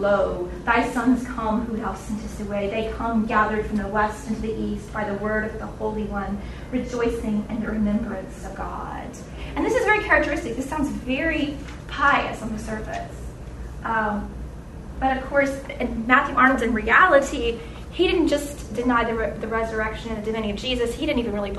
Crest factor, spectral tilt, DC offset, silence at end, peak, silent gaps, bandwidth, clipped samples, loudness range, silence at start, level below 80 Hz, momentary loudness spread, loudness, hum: 22 dB; -5.5 dB/octave; under 0.1%; 0 s; -2 dBFS; none; 12.5 kHz; under 0.1%; 7 LU; 0 s; -38 dBFS; 15 LU; -23 LUFS; none